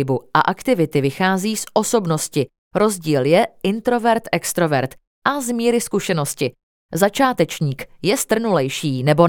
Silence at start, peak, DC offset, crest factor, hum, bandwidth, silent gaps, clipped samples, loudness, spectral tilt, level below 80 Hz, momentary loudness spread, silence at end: 0 s; 0 dBFS; under 0.1%; 18 dB; none; 19 kHz; 2.58-2.71 s, 5.07-5.22 s, 6.63-6.89 s; under 0.1%; -19 LUFS; -5 dB/octave; -54 dBFS; 7 LU; 0 s